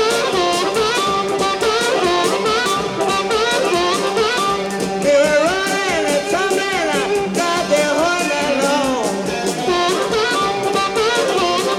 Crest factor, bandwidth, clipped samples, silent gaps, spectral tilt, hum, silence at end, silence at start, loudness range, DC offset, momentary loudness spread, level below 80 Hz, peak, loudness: 14 dB; 17 kHz; under 0.1%; none; -3 dB/octave; none; 0 s; 0 s; 1 LU; under 0.1%; 3 LU; -48 dBFS; -4 dBFS; -17 LUFS